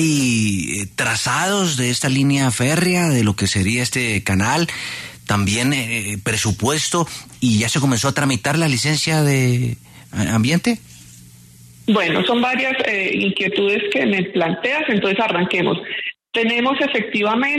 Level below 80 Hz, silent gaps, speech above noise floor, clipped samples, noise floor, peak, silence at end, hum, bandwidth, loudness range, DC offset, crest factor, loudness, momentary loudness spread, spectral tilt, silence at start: -50 dBFS; none; 26 dB; under 0.1%; -44 dBFS; -4 dBFS; 0 s; none; 13.5 kHz; 2 LU; under 0.1%; 14 dB; -18 LUFS; 6 LU; -4 dB/octave; 0 s